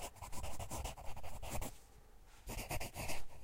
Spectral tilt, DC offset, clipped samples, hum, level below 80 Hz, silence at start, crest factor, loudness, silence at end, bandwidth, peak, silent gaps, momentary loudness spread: -3.5 dB/octave; under 0.1%; under 0.1%; none; -50 dBFS; 0 s; 14 dB; -47 LUFS; 0 s; 16 kHz; -26 dBFS; none; 18 LU